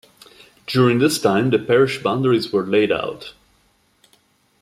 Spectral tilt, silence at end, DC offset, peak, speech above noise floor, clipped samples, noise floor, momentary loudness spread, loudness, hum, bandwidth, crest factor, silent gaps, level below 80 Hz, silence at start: -5.5 dB/octave; 1.3 s; under 0.1%; -4 dBFS; 43 dB; under 0.1%; -60 dBFS; 14 LU; -18 LUFS; none; 15.5 kHz; 16 dB; none; -60 dBFS; 0.7 s